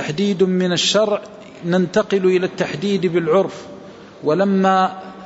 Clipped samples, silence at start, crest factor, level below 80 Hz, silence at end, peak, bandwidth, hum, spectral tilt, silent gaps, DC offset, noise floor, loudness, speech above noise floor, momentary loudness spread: under 0.1%; 0 s; 14 dB; -60 dBFS; 0 s; -4 dBFS; 8 kHz; none; -5 dB/octave; none; under 0.1%; -38 dBFS; -18 LUFS; 21 dB; 11 LU